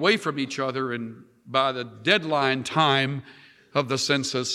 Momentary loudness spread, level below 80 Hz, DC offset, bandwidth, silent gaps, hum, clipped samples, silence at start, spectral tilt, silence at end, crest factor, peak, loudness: 8 LU; -72 dBFS; under 0.1%; 14 kHz; none; none; under 0.1%; 0 s; -4 dB/octave; 0 s; 20 dB; -6 dBFS; -24 LUFS